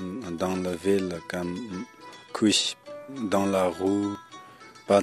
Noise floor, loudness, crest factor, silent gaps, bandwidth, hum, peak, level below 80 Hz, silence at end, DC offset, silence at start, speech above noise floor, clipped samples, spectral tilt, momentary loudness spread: -48 dBFS; -27 LUFS; 20 dB; none; 14 kHz; none; -6 dBFS; -64 dBFS; 0 s; under 0.1%; 0 s; 22 dB; under 0.1%; -4.5 dB/octave; 20 LU